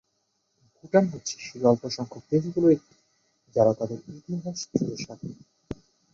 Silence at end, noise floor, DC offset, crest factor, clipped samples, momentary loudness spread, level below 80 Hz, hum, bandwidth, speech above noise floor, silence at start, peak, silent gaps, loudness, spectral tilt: 0.4 s; -74 dBFS; under 0.1%; 22 dB; under 0.1%; 19 LU; -62 dBFS; none; 7.8 kHz; 49 dB; 0.85 s; -6 dBFS; none; -26 LUFS; -6 dB/octave